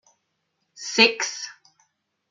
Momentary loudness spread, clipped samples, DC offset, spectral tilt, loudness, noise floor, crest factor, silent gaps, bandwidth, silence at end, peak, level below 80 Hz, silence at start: 19 LU; under 0.1%; under 0.1%; -1 dB/octave; -20 LUFS; -75 dBFS; 26 dB; none; 9.4 kHz; 0.8 s; 0 dBFS; -76 dBFS; 0.75 s